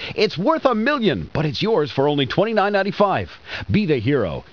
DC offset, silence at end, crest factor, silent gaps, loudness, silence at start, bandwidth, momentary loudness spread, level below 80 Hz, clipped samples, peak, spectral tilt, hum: 0.3%; 0.1 s; 16 dB; none; -20 LUFS; 0 s; 5.4 kHz; 5 LU; -46 dBFS; under 0.1%; -4 dBFS; -7 dB/octave; none